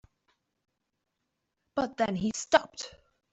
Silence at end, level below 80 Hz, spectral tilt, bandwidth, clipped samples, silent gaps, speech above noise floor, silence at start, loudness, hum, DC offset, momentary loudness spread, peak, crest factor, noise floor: 0.45 s; -64 dBFS; -4 dB/octave; 8.2 kHz; under 0.1%; none; 54 dB; 1.75 s; -29 LUFS; none; under 0.1%; 16 LU; -8 dBFS; 26 dB; -83 dBFS